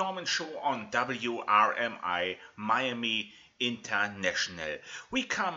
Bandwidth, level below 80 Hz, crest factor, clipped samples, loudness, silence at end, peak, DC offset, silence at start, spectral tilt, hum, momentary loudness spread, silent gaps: 8 kHz; -70 dBFS; 22 dB; under 0.1%; -30 LUFS; 0 s; -10 dBFS; under 0.1%; 0 s; -2.5 dB/octave; none; 9 LU; none